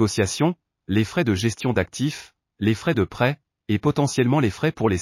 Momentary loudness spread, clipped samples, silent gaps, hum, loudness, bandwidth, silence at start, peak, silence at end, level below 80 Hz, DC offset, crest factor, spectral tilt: 6 LU; under 0.1%; none; none; -23 LUFS; 15 kHz; 0 s; -6 dBFS; 0 s; -50 dBFS; under 0.1%; 16 dB; -5.5 dB/octave